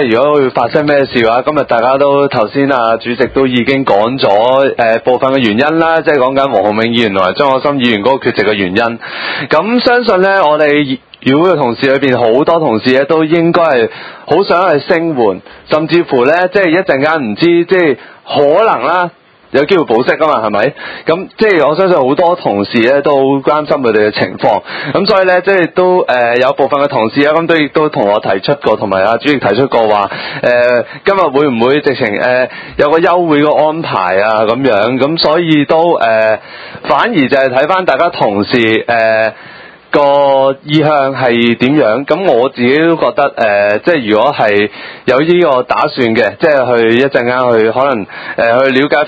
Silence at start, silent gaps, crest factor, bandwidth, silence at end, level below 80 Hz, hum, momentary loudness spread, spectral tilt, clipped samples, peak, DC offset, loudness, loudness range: 0 s; none; 10 dB; 8 kHz; 0 s; -48 dBFS; none; 4 LU; -7.5 dB/octave; 0.5%; 0 dBFS; under 0.1%; -10 LUFS; 1 LU